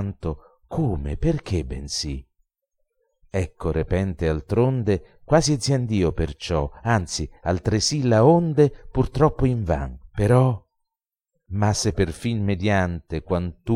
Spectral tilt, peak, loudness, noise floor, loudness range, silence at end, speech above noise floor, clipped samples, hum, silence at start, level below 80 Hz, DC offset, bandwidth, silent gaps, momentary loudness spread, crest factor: -6 dB/octave; -4 dBFS; -23 LUFS; -85 dBFS; 7 LU; 0 s; 63 dB; under 0.1%; none; 0 s; -36 dBFS; under 0.1%; 12.5 kHz; none; 11 LU; 18 dB